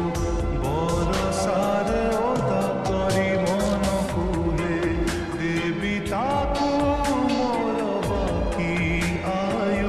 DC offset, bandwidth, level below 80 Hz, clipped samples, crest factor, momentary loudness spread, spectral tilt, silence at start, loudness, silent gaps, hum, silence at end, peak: under 0.1%; 14 kHz; -34 dBFS; under 0.1%; 12 dB; 3 LU; -6 dB/octave; 0 s; -24 LUFS; none; none; 0 s; -10 dBFS